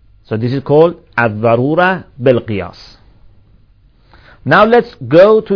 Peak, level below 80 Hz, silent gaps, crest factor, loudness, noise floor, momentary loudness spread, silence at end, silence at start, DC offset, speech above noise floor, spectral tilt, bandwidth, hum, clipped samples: 0 dBFS; -46 dBFS; none; 12 dB; -12 LUFS; -48 dBFS; 14 LU; 0 s; 0.3 s; 0.2%; 37 dB; -8.5 dB/octave; 5.4 kHz; none; 0.8%